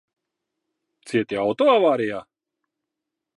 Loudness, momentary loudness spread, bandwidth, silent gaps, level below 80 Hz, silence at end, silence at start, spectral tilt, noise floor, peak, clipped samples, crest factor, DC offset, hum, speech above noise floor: -21 LUFS; 11 LU; 11.5 kHz; none; -68 dBFS; 1.15 s; 1.05 s; -6 dB/octave; -84 dBFS; -6 dBFS; under 0.1%; 18 dB; under 0.1%; none; 64 dB